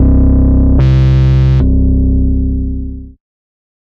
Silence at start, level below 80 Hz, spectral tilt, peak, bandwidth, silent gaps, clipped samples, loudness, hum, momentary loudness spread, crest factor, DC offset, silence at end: 0 s; -12 dBFS; -10 dB/octave; -2 dBFS; 5.2 kHz; none; under 0.1%; -11 LUFS; none; 11 LU; 8 dB; under 0.1%; 0.7 s